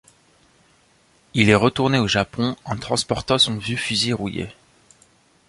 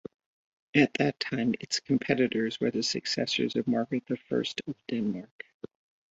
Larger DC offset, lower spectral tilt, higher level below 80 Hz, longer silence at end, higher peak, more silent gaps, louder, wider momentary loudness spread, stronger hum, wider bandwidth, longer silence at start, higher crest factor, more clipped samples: neither; about the same, -4.5 dB/octave vs -4.5 dB/octave; first, -48 dBFS vs -68 dBFS; first, 0.95 s vs 0.45 s; first, -2 dBFS vs -8 dBFS; second, none vs 5.31-5.39 s, 5.54-5.60 s; first, -20 LUFS vs -29 LUFS; second, 12 LU vs 17 LU; neither; first, 11.5 kHz vs 8 kHz; first, 1.35 s vs 0.75 s; about the same, 20 dB vs 22 dB; neither